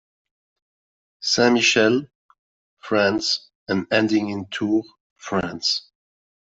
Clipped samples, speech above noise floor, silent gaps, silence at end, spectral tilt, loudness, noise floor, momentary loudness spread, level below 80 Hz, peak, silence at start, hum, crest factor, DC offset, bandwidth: under 0.1%; over 70 dB; 2.15-2.29 s, 2.39-2.77 s, 3.55-3.66 s, 5.00-5.16 s; 0.75 s; -3.5 dB/octave; -21 LUFS; under -90 dBFS; 11 LU; -60 dBFS; -4 dBFS; 1.2 s; none; 20 dB; under 0.1%; 8 kHz